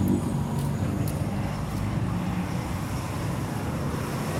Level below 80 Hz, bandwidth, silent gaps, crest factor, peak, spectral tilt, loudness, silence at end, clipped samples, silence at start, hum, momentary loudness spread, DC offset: -40 dBFS; 16 kHz; none; 16 dB; -12 dBFS; -6.5 dB/octave; -29 LUFS; 0 s; under 0.1%; 0 s; none; 3 LU; under 0.1%